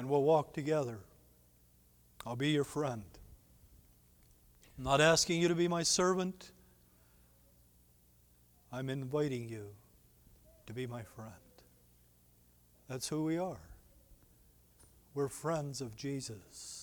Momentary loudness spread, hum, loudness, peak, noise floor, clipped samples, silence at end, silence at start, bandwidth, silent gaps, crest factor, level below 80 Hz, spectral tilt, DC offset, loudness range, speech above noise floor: 21 LU; 60 Hz at -65 dBFS; -35 LUFS; -14 dBFS; -66 dBFS; under 0.1%; 0 s; 0 s; 19.5 kHz; none; 24 dB; -64 dBFS; -4 dB/octave; under 0.1%; 11 LU; 32 dB